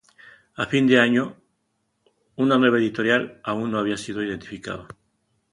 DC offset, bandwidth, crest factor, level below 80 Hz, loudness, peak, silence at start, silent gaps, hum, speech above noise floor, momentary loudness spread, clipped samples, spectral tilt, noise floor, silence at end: under 0.1%; 11 kHz; 22 dB; -60 dBFS; -22 LUFS; -2 dBFS; 0.6 s; none; none; 51 dB; 16 LU; under 0.1%; -5.5 dB/octave; -73 dBFS; 0.7 s